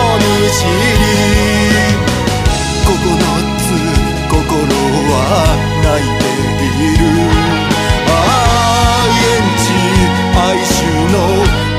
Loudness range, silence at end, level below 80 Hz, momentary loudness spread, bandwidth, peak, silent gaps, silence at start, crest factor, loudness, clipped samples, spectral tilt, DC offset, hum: 2 LU; 0 s; -20 dBFS; 4 LU; 15.5 kHz; 0 dBFS; none; 0 s; 10 dB; -11 LUFS; under 0.1%; -4.5 dB/octave; under 0.1%; none